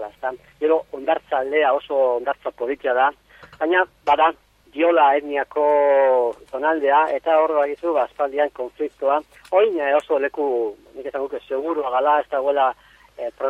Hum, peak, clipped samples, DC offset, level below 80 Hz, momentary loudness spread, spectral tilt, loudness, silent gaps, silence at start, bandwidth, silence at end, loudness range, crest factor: none; -4 dBFS; under 0.1%; under 0.1%; -60 dBFS; 11 LU; -4.5 dB/octave; -20 LUFS; none; 0 s; 8.2 kHz; 0 s; 4 LU; 16 dB